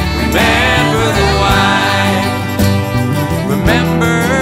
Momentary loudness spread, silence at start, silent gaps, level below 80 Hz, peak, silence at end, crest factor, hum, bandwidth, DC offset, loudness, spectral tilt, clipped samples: 5 LU; 0 s; none; -24 dBFS; 0 dBFS; 0 s; 12 dB; none; 16.5 kHz; under 0.1%; -12 LUFS; -5 dB/octave; under 0.1%